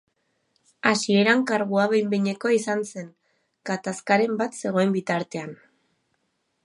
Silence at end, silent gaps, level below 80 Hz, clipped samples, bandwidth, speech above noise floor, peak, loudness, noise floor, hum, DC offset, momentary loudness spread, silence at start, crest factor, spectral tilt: 1.1 s; none; -76 dBFS; under 0.1%; 11.5 kHz; 50 dB; -2 dBFS; -23 LUFS; -73 dBFS; none; under 0.1%; 15 LU; 0.85 s; 22 dB; -5 dB/octave